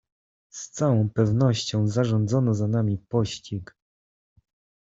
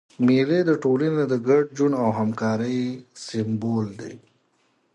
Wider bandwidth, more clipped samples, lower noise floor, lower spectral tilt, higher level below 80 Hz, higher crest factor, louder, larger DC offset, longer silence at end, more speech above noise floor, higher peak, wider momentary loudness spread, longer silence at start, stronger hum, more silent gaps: second, 7.8 kHz vs 9.6 kHz; neither; first, under -90 dBFS vs -66 dBFS; about the same, -6.5 dB/octave vs -7 dB/octave; first, -58 dBFS vs -66 dBFS; about the same, 16 dB vs 16 dB; about the same, -24 LUFS vs -23 LUFS; neither; first, 1.15 s vs 0.75 s; first, over 67 dB vs 44 dB; about the same, -8 dBFS vs -8 dBFS; about the same, 14 LU vs 12 LU; first, 0.55 s vs 0.2 s; neither; neither